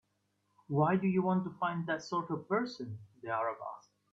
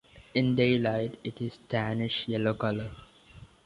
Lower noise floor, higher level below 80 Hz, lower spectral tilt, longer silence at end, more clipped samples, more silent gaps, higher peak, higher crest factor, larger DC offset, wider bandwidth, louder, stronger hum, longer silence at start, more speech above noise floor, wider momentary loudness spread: first, -78 dBFS vs -53 dBFS; second, -76 dBFS vs -58 dBFS; about the same, -7.5 dB/octave vs -8 dB/octave; first, 0.35 s vs 0.2 s; neither; neither; second, -16 dBFS vs -12 dBFS; about the same, 20 dB vs 18 dB; neither; second, 7.6 kHz vs 10.5 kHz; second, -34 LUFS vs -29 LUFS; neither; first, 0.7 s vs 0.15 s; first, 45 dB vs 24 dB; first, 15 LU vs 12 LU